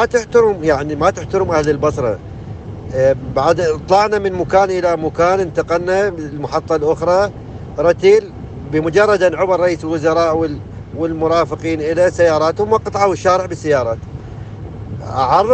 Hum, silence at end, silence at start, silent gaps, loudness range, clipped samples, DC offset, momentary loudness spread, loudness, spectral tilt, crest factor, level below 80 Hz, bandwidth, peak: none; 0 s; 0 s; none; 2 LU; under 0.1%; under 0.1%; 16 LU; -15 LUFS; -6 dB/octave; 16 dB; -38 dBFS; 8.6 kHz; 0 dBFS